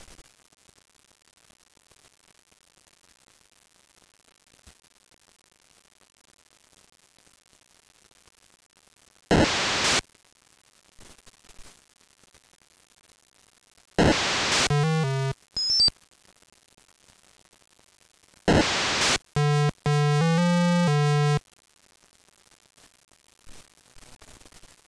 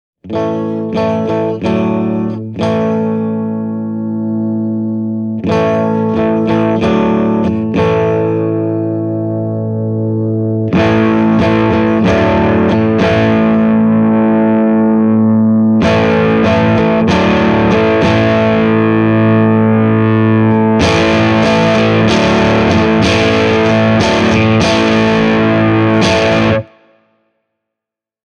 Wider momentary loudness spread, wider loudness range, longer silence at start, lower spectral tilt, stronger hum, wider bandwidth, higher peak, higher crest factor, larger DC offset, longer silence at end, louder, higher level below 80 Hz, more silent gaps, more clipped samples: about the same, 6 LU vs 7 LU; about the same, 7 LU vs 5 LU; first, 9.3 s vs 0.25 s; second, -4.5 dB/octave vs -7 dB/octave; neither; first, 11 kHz vs 9.4 kHz; second, -8 dBFS vs 0 dBFS; first, 20 dB vs 10 dB; neither; second, 0.75 s vs 1.65 s; second, -23 LUFS vs -11 LUFS; second, -48 dBFS vs -36 dBFS; neither; neither